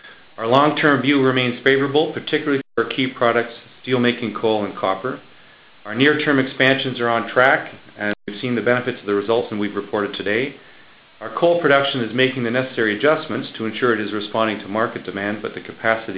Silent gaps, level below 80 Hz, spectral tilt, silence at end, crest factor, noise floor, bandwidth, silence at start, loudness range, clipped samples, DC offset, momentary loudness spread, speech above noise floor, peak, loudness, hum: none; -60 dBFS; -8 dB/octave; 0 s; 20 dB; -47 dBFS; 5.4 kHz; 0.05 s; 4 LU; under 0.1%; under 0.1%; 11 LU; 28 dB; 0 dBFS; -19 LUFS; none